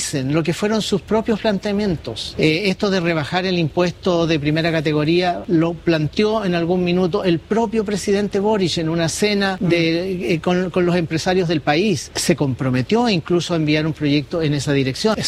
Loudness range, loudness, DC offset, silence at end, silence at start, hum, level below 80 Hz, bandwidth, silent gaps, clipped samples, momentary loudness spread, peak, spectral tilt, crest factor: 1 LU; -19 LUFS; under 0.1%; 0 s; 0 s; none; -46 dBFS; 15 kHz; none; under 0.1%; 3 LU; -2 dBFS; -5.5 dB/octave; 16 dB